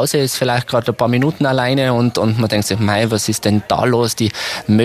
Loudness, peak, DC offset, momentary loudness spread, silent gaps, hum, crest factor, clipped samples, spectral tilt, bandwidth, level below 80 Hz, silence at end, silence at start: -16 LUFS; 0 dBFS; under 0.1%; 2 LU; none; none; 14 dB; under 0.1%; -5 dB/octave; 15.5 kHz; -48 dBFS; 0 s; 0 s